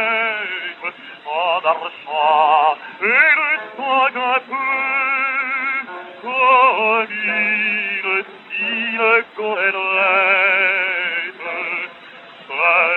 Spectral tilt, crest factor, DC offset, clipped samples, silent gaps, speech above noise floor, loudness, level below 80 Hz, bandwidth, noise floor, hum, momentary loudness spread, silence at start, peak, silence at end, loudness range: -5 dB/octave; 18 dB; under 0.1%; under 0.1%; none; 24 dB; -17 LUFS; -82 dBFS; 5.4 kHz; -40 dBFS; none; 12 LU; 0 s; 0 dBFS; 0 s; 2 LU